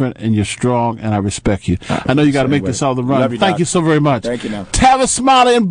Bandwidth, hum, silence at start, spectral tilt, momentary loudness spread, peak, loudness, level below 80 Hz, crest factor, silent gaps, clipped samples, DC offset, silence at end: 10.5 kHz; none; 0 s; -5 dB/octave; 8 LU; -2 dBFS; -14 LUFS; -34 dBFS; 12 dB; none; under 0.1%; under 0.1%; 0 s